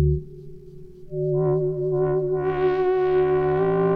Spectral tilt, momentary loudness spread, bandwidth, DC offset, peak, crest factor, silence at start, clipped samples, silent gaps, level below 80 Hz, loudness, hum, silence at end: -11 dB/octave; 9 LU; 4.4 kHz; under 0.1%; -10 dBFS; 12 dB; 0 s; under 0.1%; none; -38 dBFS; -22 LUFS; none; 0 s